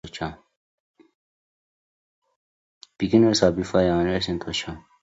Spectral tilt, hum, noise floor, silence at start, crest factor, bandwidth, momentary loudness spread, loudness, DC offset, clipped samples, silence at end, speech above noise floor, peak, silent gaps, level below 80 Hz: -5.5 dB/octave; none; under -90 dBFS; 0.05 s; 22 dB; 8 kHz; 15 LU; -22 LUFS; under 0.1%; under 0.1%; 0.25 s; over 68 dB; -4 dBFS; 0.56-0.94 s, 1.15-2.22 s, 2.36-2.81 s; -48 dBFS